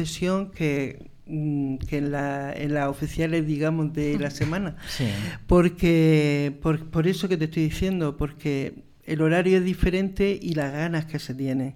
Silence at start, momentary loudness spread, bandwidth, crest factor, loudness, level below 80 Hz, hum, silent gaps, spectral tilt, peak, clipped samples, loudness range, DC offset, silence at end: 0 s; 10 LU; 15.5 kHz; 16 dB; -25 LUFS; -40 dBFS; none; none; -7 dB/octave; -8 dBFS; under 0.1%; 4 LU; under 0.1%; 0 s